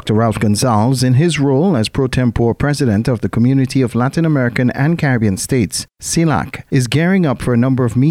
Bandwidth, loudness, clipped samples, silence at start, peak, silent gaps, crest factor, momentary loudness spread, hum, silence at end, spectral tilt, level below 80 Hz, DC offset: 15.5 kHz; -15 LUFS; under 0.1%; 0.05 s; 0 dBFS; none; 14 dB; 3 LU; none; 0 s; -6 dB/octave; -38 dBFS; 0.1%